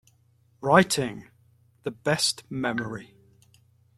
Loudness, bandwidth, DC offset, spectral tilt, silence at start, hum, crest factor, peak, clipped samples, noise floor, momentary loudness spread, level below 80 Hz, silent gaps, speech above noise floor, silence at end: -25 LUFS; 14.5 kHz; under 0.1%; -4 dB/octave; 0.6 s; none; 26 dB; -4 dBFS; under 0.1%; -63 dBFS; 18 LU; -62 dBFS; none; 38 dB; 0.95 s